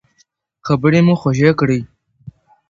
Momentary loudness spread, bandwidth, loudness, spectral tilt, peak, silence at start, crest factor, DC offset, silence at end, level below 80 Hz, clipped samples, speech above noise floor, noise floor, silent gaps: 9 LU; 7.4 kHz; -15 LUFS; -7.5 dB/octave; 0 dBFS; 0.65 s; 16 dB; under 0.1%; 0.4 s; -48 dBFS; under 0.1%; 47 dB; -60 dBFS; none